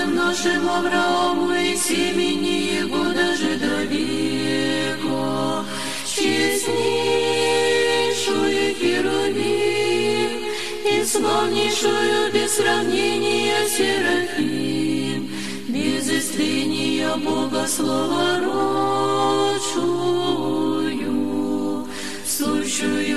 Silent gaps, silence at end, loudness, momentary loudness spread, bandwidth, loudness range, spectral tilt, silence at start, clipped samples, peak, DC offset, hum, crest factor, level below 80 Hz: none; 0 s; -20 LUFS; 5 LU; 13.5 kHz; 3 LU; -3 dB/octave; 0 s; under 0.1%; -8 dBFS; 2%; none; 14 dB; -56 dBFS